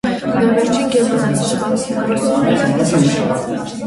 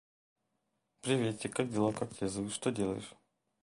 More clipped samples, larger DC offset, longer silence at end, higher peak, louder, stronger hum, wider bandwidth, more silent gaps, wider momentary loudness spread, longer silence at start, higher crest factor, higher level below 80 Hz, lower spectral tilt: neither; neither; second, 0 s vs 0.5 s; first, -2 dBFS vs -16 dBFS; first, -16 LUFS vs -35 LUFS; neither; about the same, 11.5 kHz vs 11.5 kHz; neither; second, 4 LU vs 9 LU; second, 0.05 s vs 1.05 s; second, 14 dB vs 20 dB; first, -48 dBFS vs -66 dBFS; about the same, -5.5 dB/octave vs -5 dB/octave